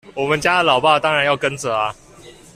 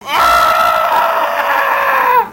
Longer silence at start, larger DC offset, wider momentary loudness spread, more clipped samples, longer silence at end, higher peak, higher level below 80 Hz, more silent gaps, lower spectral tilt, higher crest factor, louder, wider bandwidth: about the same, 0.05 s vs 0 s; neither; first, 7 LU vs 4 LU; neither; first, 0.25 s vs 0 s; about the same, -2 dBFS vs 0 dBFS; second, -52 dBFS vs -42 dBFS; neither; first, -3.5 dB/octave vs -1.5 dB/octave; about the same, 16 dB vs 12 dB; second, -17 LUFS vs -11 LUFS; second, 14.5 kHz vs 16 kHz